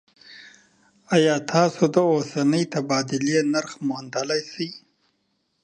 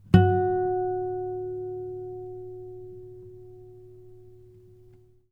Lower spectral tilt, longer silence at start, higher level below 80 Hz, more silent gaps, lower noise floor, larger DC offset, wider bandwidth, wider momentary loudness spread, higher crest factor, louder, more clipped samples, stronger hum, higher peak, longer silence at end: second, -5 dB/octave vs -9.5 dB/octave; first, 0.3 s vs 0.05 s; second, -72 dBFS vs -48 dBFS; neither; first, -71 dBFS vs -55 dBFS; neither; first, 10 kHz vs 5.2 kHz; second, 9 LU vs 25 LU; about the same, 20 dB vs 24 dB; first, -22 LUFS vs -27 LUFS; neither; neither; about the same, -4 dBFS vs -4 dBFS; about the same, 0.85 s vs 0.95 s